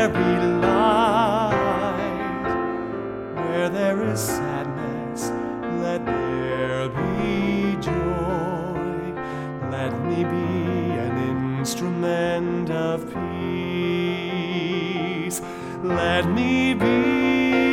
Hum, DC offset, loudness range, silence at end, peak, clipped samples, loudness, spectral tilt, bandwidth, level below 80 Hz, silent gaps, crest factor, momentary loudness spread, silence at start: none; under 0.1%; 4 LU; 0 s; -6 dBFS; under 0.1%; -23 LUFS; -6 dB/octave; 17.5 kHz; -46 dBFS; none; 16 dB; 9 LU; 0 s